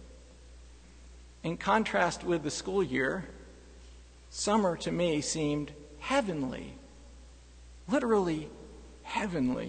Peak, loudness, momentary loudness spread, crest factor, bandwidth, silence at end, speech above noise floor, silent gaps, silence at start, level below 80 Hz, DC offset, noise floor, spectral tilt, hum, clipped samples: -12 dBFS; -31 LUFS; 19 LU; 20 dB; 9.6 kHz; 0 s; 22 dB; none; 0 s; -52 dBFS; under 0.1%; -52 dBFS; -4.5 dB/octave; 60 Hz at -55 dBFS; under 0.1%